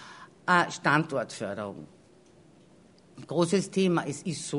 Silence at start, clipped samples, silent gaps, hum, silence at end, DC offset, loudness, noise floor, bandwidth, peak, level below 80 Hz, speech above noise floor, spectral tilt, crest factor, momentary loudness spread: 0 s; under 0.1%; none; none; 0 s; under 0.1%; -28 LUFS; -57 dBFS; 11 kHz; -8 dBFS; -70 dBFS; 30 dB; -5 dB/octave; 22 dB; 13 LU